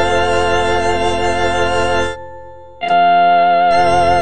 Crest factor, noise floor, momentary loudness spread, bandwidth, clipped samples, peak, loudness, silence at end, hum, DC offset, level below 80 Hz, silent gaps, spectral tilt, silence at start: 12 dB; -35 dBFS; 10 LU; 10 kHz; under 0.1%; -2 dBFS; -13 LUFS; 0 s; none; under 0.1%; -36 dBFS; none; -4.5 dB/octave; 0 s